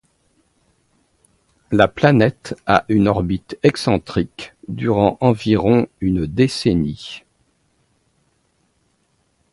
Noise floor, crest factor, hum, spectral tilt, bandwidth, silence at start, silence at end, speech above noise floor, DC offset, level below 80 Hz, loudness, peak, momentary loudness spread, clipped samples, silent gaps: -64 dBFS; 20 dB; none; -7 dB/octave; 11.5 kHz; 1.7 s; 2.35 s; 47 dB; under 0.1%; -42 dBFS; -18 LUFS; 0 dBFS; 14 LU; under 0.1%; none